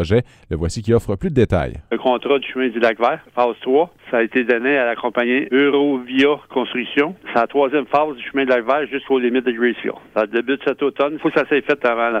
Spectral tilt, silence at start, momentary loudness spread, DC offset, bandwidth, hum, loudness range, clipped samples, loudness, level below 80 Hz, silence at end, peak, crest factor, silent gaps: -6.5 dB/octave; 0 s; 5 LU; under 0.1%; 10 kHz; none; 2 LU; under 0.1%; -18 LUFS; -42 dBFS; 0 s; -2 dBFS; 16 dB; none